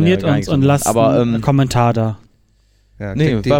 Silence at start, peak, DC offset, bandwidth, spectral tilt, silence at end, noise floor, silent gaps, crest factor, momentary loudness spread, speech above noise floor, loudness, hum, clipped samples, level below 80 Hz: 0 s; -2 dBFS; under 0.1%; 16.5 kHz; -6.5 dB/octave; 0 s; -55 dBFS; none; 14 dB; 10 LU; 41 dB; -15 LUFS; none; under 0.1%; -40 dBFS